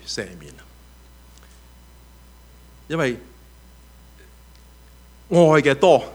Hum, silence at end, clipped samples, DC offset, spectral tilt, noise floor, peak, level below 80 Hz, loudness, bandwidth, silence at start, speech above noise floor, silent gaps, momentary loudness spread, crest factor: 60 Hz at -50 dBFS; 0 s; under 0.1%; under 0.1%; -5.5 dB/octave; -47 dBFS; -2 dBFS; -48 dBFS; -18 LUFS; over 20 kHz; 0.05 s; 30 dB; none; 22 LU; 22 dB